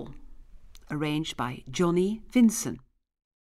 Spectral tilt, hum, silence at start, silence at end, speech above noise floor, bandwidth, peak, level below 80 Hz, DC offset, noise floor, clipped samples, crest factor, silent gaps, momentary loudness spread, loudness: -5 dB/octave; none; 0 s; 0.65 s; 21 dB; 15 kHz; -12 dBFS; -52 dBFS; under 0.1%; -47 dBFS; under 0.1%; 16 dB; none; 14 LU; -27 LUFS